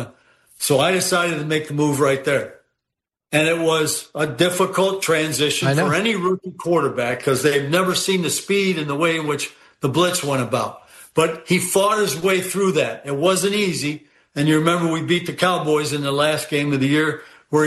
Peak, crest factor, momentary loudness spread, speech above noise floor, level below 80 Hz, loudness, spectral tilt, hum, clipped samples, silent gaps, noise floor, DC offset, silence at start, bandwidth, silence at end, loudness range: -2 dBFS; 18 dB; 6 LU; 65 dB; -60 dBFS; -19 LUFS; -4 dB/octave; none; under 0.1%; none; -84 dBFS; under 0.1%; 0 s; 12.5 kHz; 0 s; 2 LU